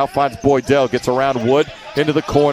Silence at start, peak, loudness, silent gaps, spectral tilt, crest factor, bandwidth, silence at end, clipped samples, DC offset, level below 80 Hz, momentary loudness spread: 0 s; 0 dBFS; -16 LUFS; none; -6 dB/octave; 16 dB; 14 kHz; 0 s; under 0.1%; under 0.1%; -44 dBFS; 3 LU